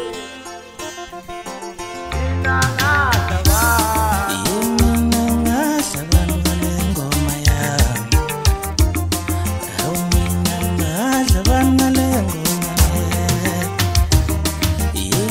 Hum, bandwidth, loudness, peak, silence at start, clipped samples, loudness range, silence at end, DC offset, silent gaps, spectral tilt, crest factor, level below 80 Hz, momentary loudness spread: none; 16.5 kHz; -17 LUFS; 0 dBFS; 0 s; under 0.1%; 3 LU; 0 s; under 0.1%; none; -4.5 dB/octave; 16 dB; -24 dBFS; 14 LU